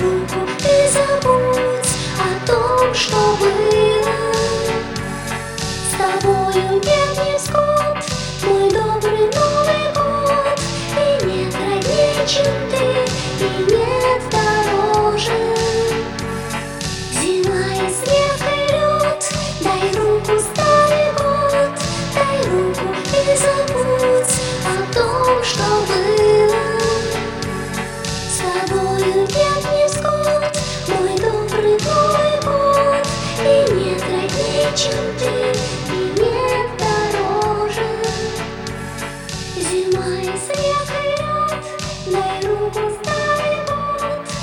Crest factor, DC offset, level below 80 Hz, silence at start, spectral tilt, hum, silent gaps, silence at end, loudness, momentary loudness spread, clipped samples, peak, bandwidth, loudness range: 16 dB; under 0.1%; -38 dBFS; 0 s; -4 dB/octave; none; none; 0 s; -17 LUFS; 8 LU; under 0.1%; 0 dBFS; 18 kHz; 4 LU